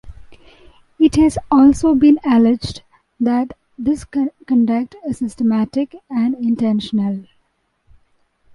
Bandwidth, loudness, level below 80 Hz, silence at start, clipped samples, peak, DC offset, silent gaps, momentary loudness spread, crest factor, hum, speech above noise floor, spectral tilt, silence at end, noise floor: 11.5 kHz; -16 LUFS; -42 dBFS; 0.05 s; under 0.1%; -2 dBFS; under 0.1%; none; 12 LU; 14 dB; none; 49 dB; -6.5 dB/octave; 1.35 s; -65 dBFS